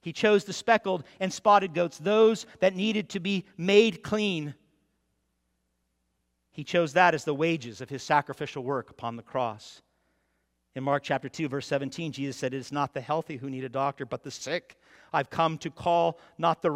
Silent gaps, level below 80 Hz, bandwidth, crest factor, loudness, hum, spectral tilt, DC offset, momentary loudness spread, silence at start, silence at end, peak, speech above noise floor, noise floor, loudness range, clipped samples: none; -70 dBFS; 13 kHz; 22 dB; -28 LUFS; none; -5 dB/octave; under 0.1%; 14 LU; 0.05 s; 0 s; -6 dBFS; 49 dB; -77 dBFS; 8 LU; under 0.1%